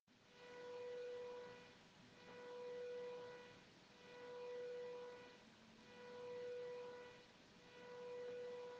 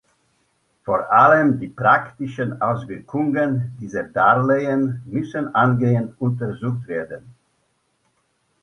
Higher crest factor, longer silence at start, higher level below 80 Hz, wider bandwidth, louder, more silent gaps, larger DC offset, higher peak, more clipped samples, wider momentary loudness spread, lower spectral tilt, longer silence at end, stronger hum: second, 12 dB vs 20 dB; second, 0.1 s vs 0.85 s; second, -90 dBFS vs -58 dBFS; first, 8.6 kHz vs 6.6 kHz; second, -55 LUFS vs -20 LUFS; neither; neither; second, -44 dBFS vs 0 dBFS; neither; about the same, 13 LU vs 14 LU; second, -4 dB/octave vs -8.5 dB/octave; second, 0 s vs 1.3 s; neither